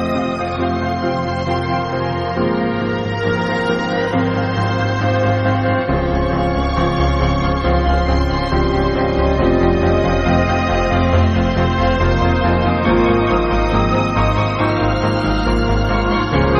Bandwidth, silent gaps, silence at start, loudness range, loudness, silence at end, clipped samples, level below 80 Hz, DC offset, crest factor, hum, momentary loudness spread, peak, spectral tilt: 8 kHz; none; 0 s; 3 LU; -17 LUFS; 0 s; under 0.1%; -24 dBFS; under 0.1%; 14 dB; none; 5 LU; -2 dBFS; -7.5 dB/octave